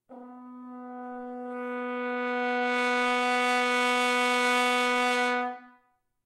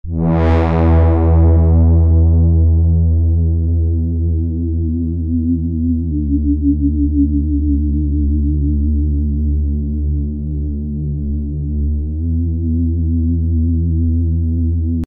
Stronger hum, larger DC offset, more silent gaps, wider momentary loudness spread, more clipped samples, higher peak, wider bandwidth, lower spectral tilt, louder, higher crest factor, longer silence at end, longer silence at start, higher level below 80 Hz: neither; neither; neither; first, 20 LU vs 8 LU; neither; second, -12 dBFS vs -4 dBFS; first, 15.5 kHz vs 2.9 kHz; second, -1 dB/octave vs -12 dB/octave; second, -26 LUFS vs -16 LUFS; first, 16 dB vs 10 dB; first, 0.55 s vs 0 s; about the same, 0.1 s vs 0.05 s; second, -80 dBFS vs -16 dBFS